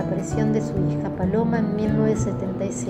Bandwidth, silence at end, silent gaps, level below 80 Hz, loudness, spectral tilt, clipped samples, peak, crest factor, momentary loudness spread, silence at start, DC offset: 10 kHz; 0 s; none; -42 dBFS; -23 LUFS; -7.5 dB/octave; under 0.1%; -8 dBFS; 14 dB; 4 LU; 0 s; under 0.1%